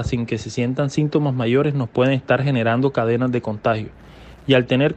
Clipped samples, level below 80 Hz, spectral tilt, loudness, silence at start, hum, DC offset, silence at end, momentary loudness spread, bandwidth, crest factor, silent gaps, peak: under 0.1%; -44 dBFS; -7 dB/octave; -20 LUFS; 0 s; none; under 0.1%; 0 s; 6 LU; 8.6 kHz; 16 dB; none; -4 dBFS